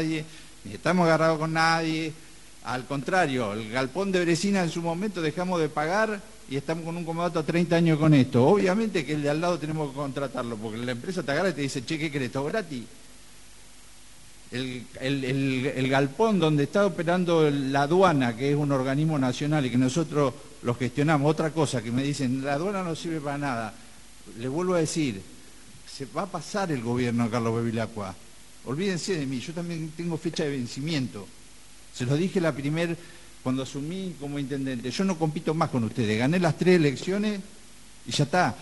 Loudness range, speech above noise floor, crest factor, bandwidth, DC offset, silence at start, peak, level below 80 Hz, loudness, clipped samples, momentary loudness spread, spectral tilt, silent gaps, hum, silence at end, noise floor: 7 LU; 26 dB; 18 dB; 11.5 kHz; 0.4%; 0 s; -8 dBFS; -58 dBFS; -26 LUFS; under 0.1%; 12 LU; -6 dB/octave; none; none; 0 s; -52 dBFS